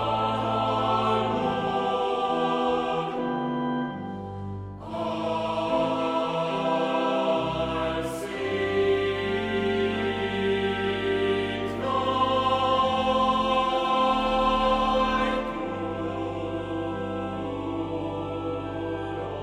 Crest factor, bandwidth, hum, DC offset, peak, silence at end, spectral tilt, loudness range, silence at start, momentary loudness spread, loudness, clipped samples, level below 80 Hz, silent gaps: 14 dB; 14 kHz; none; under 0.1%; -12 dBFS; 0 s; -6 dB/octave; 6 LU; 0 s; 8 LU; -26 LUFS; under 0.1%; -46 dBFS; none